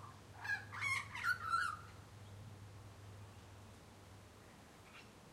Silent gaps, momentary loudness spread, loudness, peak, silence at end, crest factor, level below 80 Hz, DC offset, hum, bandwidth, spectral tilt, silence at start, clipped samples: none; 21 LU; -40 LUFS; -28 dBFS; 0 s; 20 dB; -68 dBFS; under 0.1%; none; 16 kHz; -3 dB/octave; 0 s; under 0.1%